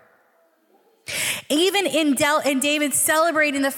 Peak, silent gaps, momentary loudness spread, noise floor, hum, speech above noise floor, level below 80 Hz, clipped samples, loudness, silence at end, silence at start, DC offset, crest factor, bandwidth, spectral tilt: -8 dBFS; none; 6 LU; -61 dBFS; none; 42 dB; -68 dBFS; under 0.1%; -19 LUFS; 0 s; 1.1 s; under 0.1%; 14 dB; 18 kHz; -1.5 dB/octave